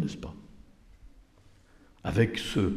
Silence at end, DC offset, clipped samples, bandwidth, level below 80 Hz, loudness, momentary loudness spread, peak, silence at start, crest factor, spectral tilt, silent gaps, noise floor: 0 s; under 0.1%; under 0.1%; 14.5 kHz; -50 dBFS; -30 LUFS; 17 LU; -12 dBFS; 0 s; 20 dB; -6 dB/octave; none; -58 dBFS